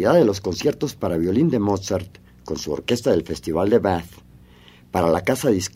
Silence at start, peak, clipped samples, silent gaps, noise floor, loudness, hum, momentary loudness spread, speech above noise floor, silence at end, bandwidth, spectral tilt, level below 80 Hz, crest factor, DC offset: 0 s; -2 dBFS; under 0.1%; none; -48 dBFS; -21 LUFS; none; 9 LU; 28 dB; 0.05 s; 16 kHz; -6 dB/octave; -48 dBFS; 18 dB; under 0.1%